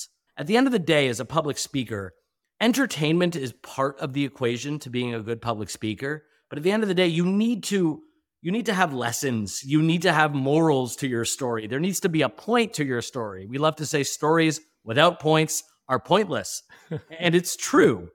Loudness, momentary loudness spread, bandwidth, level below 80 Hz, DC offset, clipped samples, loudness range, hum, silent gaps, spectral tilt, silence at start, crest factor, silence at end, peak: -24 LUFS; 12 LU; 18.5 kHz; -64 dBFS; under 0.1%; under 0.1%; 3 LU; none; none; -4.5 dB/octave; 0 s; 20 dB; 0.05 s; -4 dBFS